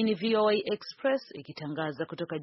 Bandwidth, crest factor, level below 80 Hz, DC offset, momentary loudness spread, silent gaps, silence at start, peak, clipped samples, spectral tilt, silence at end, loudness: 6 kHz; 14 dB; -74 dBFS; under 0.1%; 12 LU; none; 0 s; -16 dBFS; under 0.1%; -4 dB/octave; 0 s; -30 LUFS